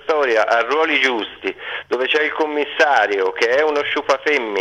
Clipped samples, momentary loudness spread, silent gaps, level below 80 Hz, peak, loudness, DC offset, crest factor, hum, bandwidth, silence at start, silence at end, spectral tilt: under 0.1%; 9 LU; none; -62 dBFS; 0 dBFS; -17 LUFS; under 0.1%; 18 dB; none; 11.5 kHz; 0.05 s; 0 s; -2 dB/octave